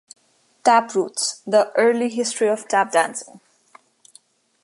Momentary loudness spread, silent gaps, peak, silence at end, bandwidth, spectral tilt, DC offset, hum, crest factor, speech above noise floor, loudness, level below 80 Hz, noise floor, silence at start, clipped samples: 7 LU; none; -2 dBFS; 1.25 s; 11.5 kHz; -2.5 dB/octave; under 0.1%; none; 20 dB; 35 dB; -20 LUFS; -80 dBFS; -55 dBFS; 0.65 s; under 0.1%